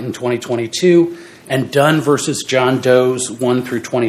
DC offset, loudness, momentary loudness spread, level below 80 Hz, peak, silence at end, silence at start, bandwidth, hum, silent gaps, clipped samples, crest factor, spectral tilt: under 0.1%; -15 LUFS; 8 LU; -62 dBFS; 0 dBFS; 0 s; 0 s; 15.5 kHz; none; none; under 0.1%; 16 dB; -5 dB/octave